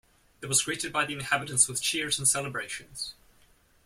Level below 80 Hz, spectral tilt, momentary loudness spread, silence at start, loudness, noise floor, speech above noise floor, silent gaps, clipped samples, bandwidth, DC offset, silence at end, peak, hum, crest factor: -62 dBFS; -1 dB/octave; 14 LU; 0.4 s; -27 LUFS; -62 dBFS; 33 dB; none; under 0.1%; 16.5 kHz; under 0.1%; 0.75 s; -8 dBFS; none; 22 dB